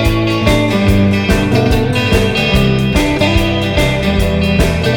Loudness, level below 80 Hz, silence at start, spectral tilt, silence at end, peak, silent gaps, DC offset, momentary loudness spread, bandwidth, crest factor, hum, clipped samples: -12 LUFS; -20 dBFS; 0 s; -6 dB/octave; 0 s; 0 dBFS; none; under 0.1%; 2 LU; 19.5 kHz; 12 dB; none; under 0.1%